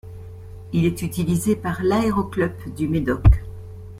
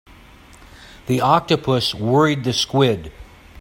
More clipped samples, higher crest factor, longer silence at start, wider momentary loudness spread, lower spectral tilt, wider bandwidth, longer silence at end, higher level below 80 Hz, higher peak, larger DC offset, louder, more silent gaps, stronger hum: neither; about the same, 20 dB vs 20 dB; second, 0.05 s vs 0.8 s; first, 21 LU vs 10 LU; first, -7 dB/octave vs -5.5 dB/octave; about the same, 16 kHz vs 16.5 kHz; about the same, 0 s vs 0 s; first, -28 dBFS vs -46 dBFS; about the same, -2 dBFS vs 0 dBFS; neither; second, -22 LUFS vs -18 LUFS; neither; neither